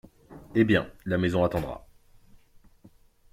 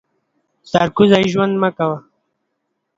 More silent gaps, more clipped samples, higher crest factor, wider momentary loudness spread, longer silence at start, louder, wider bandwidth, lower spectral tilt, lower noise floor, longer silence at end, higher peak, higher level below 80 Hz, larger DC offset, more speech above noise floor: neither; neither; about the same, 20 dB vs 18 dB; first, 12 LU vs 9 LU; second, 0.3 s vs 0.75 s; second, -26 LUFS vs -15 LUFS; first, 15.5 kHz vs 7.8 kHz; about the same, -7.5 dB/octave vs -6.5 dB/octave; second, -57 dBFS vs -73 dBFS; first, 1.55 s vs 1 s; second, -8 dBFS vs 0 dBFS; about the same, -52 dBFS vs -54 dBFS; neither; second, 32 dB vs 58 dB